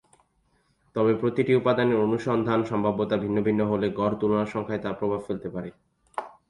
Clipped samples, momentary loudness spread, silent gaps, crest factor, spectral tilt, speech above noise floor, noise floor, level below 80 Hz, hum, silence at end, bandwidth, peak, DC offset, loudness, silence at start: under 0.1%; 13 LU; none; 16 dB; -8 dB/octave; 43 dB; -68 dBFS; -58 dBFS; none; 0.2 s; 11 kHz; -10 dBFS; under 0.1%; -25 LUFS; 0.95 s